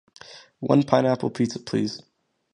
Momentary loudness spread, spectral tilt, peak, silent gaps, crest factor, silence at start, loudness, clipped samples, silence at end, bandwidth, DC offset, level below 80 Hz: 24 LU; -6.5 dB/octave; -2 dBFS; none; 22 dB; 0.3 s; -23 LUFS; under 0.1%; 0.55 s; 11 kHz; under 0.1%; -64 dBFS